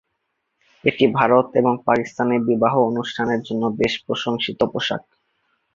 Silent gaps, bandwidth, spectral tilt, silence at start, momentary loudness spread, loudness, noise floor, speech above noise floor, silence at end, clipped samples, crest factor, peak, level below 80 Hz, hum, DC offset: none; 7.4 kHz; -6 dB/octave; 0.85 s; 7 LU; -20 LUFS; -74 dBFS; 55 dB; 0.75 s; under 0.1%; 20 dB; -2 dBFS; -56 dBFS; none; under 0.1%